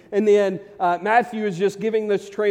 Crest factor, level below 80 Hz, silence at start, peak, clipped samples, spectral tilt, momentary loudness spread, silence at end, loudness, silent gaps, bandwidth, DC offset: 16 dB; -68 dBFS; 0.1 s; -4 dBFS; under 0.1%; -6 dB/octave; 7 LU; 0 s; -21 LUFS; none; 10 kHz; under 0.1%